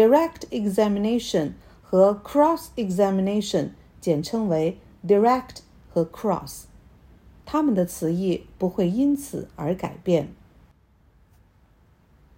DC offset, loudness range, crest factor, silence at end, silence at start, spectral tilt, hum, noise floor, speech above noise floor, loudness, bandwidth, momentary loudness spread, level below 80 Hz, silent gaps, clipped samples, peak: under 0.1%; 5 LU; 18 dB; 2.05 s; 0 s; -6.5 dB/octave; none; -58 dBFS; 36 dB; -24 LUFS; 16.5 kHz; 12 LU; -52 dBFS; none; under 0.1%; -6 dBFS